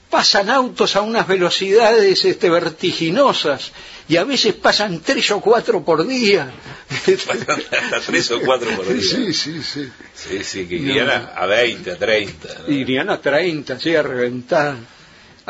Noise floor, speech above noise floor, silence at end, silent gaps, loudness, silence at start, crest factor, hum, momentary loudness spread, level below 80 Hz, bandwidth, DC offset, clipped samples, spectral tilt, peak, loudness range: -45 dBFS; 28 dB; 0.65 s; none; -17 LUFS; 0.1 s; 16 dB; none; 11 LU; -54 dBFS; 8 kHz; under 0.1%; under 0.1%; -3.5 dB/octave; -2 dBFS; 4 LU